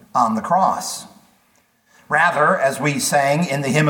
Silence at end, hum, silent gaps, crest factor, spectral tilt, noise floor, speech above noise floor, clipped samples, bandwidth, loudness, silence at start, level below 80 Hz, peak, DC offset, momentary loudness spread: 0 s; none; none; 18 dB; -4.5 dB/octave; -60 dBFS; 42 dB; under 0.1%; 19 kHz; -18 LUFS; 0.15 s; -66 dBFS; -2 dBFS; under 0.1%; 7 LU